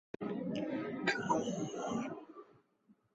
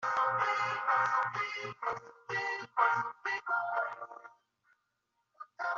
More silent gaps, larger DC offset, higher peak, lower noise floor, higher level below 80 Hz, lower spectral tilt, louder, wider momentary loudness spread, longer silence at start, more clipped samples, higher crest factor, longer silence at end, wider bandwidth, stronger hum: neither; neither; second, -18 dBFS vs -14 dBFS; second, -71 dBFS vs -82 dBFS; first, -76 dBFS vs -82 dBFS; first, -4 dB/octave vs -0.5 dB/octave; second, -38 LUFS vs -33 LUFS; about the same, 14 LU vs 15 LU; first, 0.2 s vs 0 s; neither; about the same, 20 dB vs 20 dB; first, 0.7 s vs 0 s; about the same, 8 kHz vs 7.4 kHz; neither